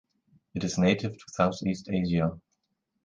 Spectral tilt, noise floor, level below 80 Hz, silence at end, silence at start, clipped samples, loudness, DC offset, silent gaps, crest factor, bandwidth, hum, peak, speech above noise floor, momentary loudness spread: -6 dB/octave; -79 dBFS; -52 dBFS; 0.7 s; 0.55 s; under 0.1%; -28 LUFS; under 0.1%; none; 20 dB; 7.6 kHz; none; -8 dBFS; 51 dB; 9 LU